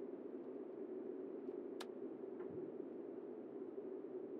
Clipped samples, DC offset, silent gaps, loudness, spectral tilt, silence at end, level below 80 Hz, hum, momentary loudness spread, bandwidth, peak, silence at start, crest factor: under 0.1%; under 0.1%; none; -50 LUFS; -6 dB/octave; 0 s; under -90 dBFS; none; 2 LU; 4.6 kHz; -36 dBFS; 0 s; 14 dB